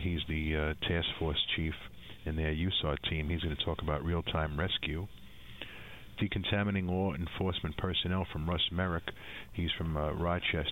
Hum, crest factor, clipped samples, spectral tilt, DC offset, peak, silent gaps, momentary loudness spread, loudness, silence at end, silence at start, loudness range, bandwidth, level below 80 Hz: none; 16 dB; under 0.1%; -7 dB/octave; 0.2%; -18 dBFS; none; 14 LU; -34 LUFS; 0 s; 0 s; 2 LU; 16 kHz; -44 dBFS